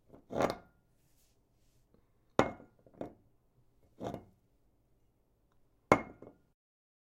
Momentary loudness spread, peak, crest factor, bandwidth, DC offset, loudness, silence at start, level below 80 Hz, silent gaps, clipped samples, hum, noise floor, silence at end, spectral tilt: 19 LU; -6 dBFS; 34 dB; 16 kHz; under 0.1%; -35 LUFS; 0.3 s; -64 dBFS; none; under 0.1%; none; -73 dBFS; 0.8 s; -6 dB/octave